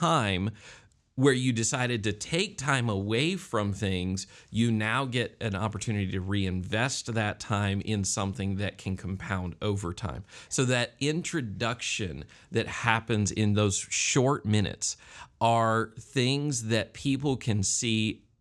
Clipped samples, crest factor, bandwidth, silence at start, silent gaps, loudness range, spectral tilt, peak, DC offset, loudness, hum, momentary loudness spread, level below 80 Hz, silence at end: under 0.1%; 24 dB; 12 kHz; 0 s; none; 4 LU; -4.5 dB/octave; -6 dBFS; under 0.1%; -29 LUFS; none; 8 LU; -58 dBFS; 0.25 s